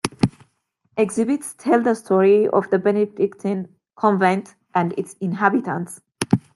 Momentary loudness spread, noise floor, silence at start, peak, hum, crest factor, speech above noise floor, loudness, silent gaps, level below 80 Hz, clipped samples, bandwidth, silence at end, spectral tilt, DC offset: 11 LU; -67 dBFS; 0.05 s; 0 dBFS; none; 20 dB; 48 dB; -20 LUFS; none; -58 dBFS; under 0.1%; 12.5 kHz; 0.15 s; -6.5 dB/octave; under 0.1%